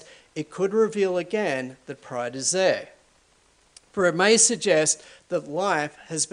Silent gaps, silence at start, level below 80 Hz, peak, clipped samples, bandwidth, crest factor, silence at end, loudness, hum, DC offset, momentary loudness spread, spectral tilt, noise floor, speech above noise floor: none; 0.35 s; -70 dBFS; -4 dBFS; under 0.1%; 10.5 kHz; 20 dB; 0.05 s; -23 LUFS; none; under 0.1%; 17 LU; -2.5 dB/octave; -61 dBFS; 37 dB